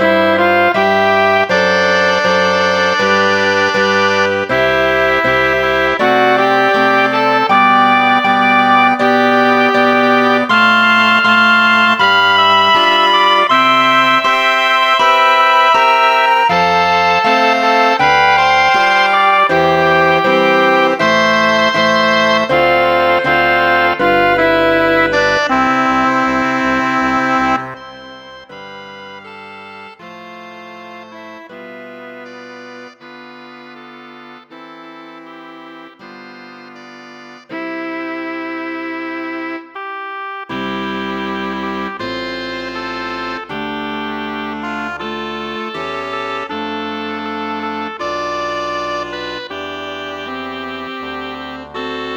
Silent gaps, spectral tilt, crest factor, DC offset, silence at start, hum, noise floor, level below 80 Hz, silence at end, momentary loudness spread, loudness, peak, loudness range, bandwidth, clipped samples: none; -4 dB/octave; 14 dB; under 0.1%; 0 s; none; -36 dBFS; -46 dBFS; 0 s; 20 LU; -12 LUFS; 0 dBFS; 19 LU; 19.5 kHz; under 0.1%